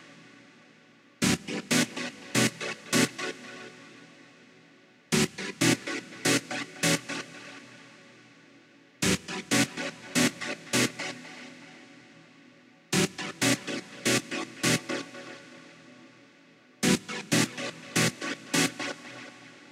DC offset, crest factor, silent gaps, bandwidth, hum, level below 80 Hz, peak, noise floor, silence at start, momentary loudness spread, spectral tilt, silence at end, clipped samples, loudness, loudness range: under 0.1%; 20 dB; none; 16 kHz; none; -64 dBFS; -10 dBFS; -58 dBFS; 0 s; 19 LU; -3 dB/octave; 0.1 s; under 0.1%; -28 LUFS; 3 LU